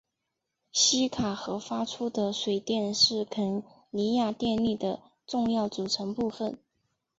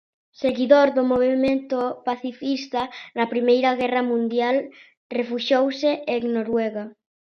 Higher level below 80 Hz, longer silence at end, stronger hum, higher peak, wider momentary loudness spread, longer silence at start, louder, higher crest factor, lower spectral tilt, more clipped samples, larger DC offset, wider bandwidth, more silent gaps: about the same, -62 dBFS vs -62 dBFS; first, 0.65 s vs 0.3 s; neither; second, -10 dBFS vs -2 dBFS; about the same, 12 LU vs 10 LU; first, 0.75 s vs 0.4 s; second, -28 LUFS vs -22 LUFS; about the same, 20 dB vs 20 dB; second, -3.5 dB/octave vs -5.5 dB/octave; neither; neither; first, 8 kHz vs 6.6 kHz; second, none vs 4.97-5.10 s